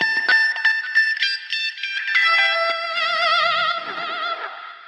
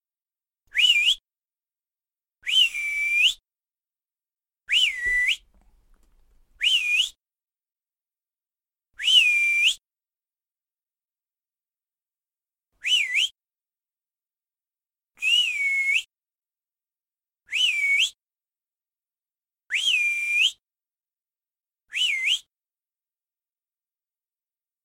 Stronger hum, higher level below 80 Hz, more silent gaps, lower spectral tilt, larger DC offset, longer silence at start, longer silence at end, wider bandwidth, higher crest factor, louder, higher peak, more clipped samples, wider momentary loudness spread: neither; second, -82 dBFS vs -62 dBFS; neither; first, 0 dB/octave vs 5 dB/octave; neither; second, 0 s vs 0.75 s; second, 0 s vs 2.45 s; second, 10.5 kHz vs 16.5 kHz; second, 14 dB vs 20 dB; about the same, -18 LUFS vs -20 LUFS; about the same, -6 dBFS vs -6 dBFS; neither; about the same, 10 LU vs 10 LU